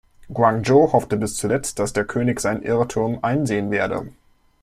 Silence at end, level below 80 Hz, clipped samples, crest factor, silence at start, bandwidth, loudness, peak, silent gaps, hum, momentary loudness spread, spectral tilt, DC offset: 0.5 s; -48 dBFS; under 0.1%; 18 dB; 0.2 s; 15.5 kHz; -20 LUFS; -2 dBFS; none; none; 8 LU; -5.5 dB/octave; under 0.1%